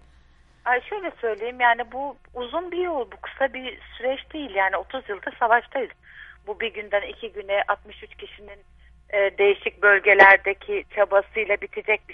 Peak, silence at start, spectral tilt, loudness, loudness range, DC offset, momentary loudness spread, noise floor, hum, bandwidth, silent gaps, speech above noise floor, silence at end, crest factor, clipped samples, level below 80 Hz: 0 dBFS; 0.65 s; -5 dB/octave; -22 LUFS; 9 LU; under 0.1%; 17 LU; -55 dBFS; none; 6.4 kHz; none; 32 dB; 0 s; 24 dB; under 0.1%; -54 dBFS